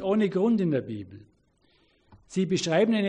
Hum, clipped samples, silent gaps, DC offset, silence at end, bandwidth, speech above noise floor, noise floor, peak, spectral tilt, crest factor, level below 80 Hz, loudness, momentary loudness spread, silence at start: none; under 0.1%; none; under 0.1%; 0 s; 9.8 kHz; 41 dB; -66 dBFS; -12 dBFS; -6 dB/octave; 14 dB; -66 dBFS; -26 LUFS; 15 LU; 0 s